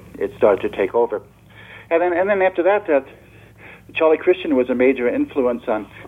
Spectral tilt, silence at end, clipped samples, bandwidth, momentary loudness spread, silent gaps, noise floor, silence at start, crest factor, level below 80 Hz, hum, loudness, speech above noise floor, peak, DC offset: -7 dB/octave; 0 s; under 0.1%; 4 kHz; 7 LU; none; -43 dBFS; 0.15 s; 18 dB; -52 dBFS; none; -19 LUFS; 25 dB; -2 dBFS; under 0.1%